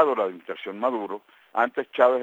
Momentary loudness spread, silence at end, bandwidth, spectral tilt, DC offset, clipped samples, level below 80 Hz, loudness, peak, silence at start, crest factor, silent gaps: 14 LU; 0 s; 7.6 kHz; -6 dB/octave; under 0.1%; under 0.1%; -90 dBFS; -26 LUFS; -4 dBFS; 0 s; 20 dB; none